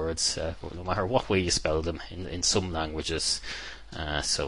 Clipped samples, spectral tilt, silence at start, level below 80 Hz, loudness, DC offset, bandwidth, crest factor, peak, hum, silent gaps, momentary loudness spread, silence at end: under 0.1%; -3 dB/octave; 0 s; -42 dBFS; -29 LUFS; 0.4%; 11.5 kHz; 20 dB; -8 dBFS; none; none; 12 LU; 0 s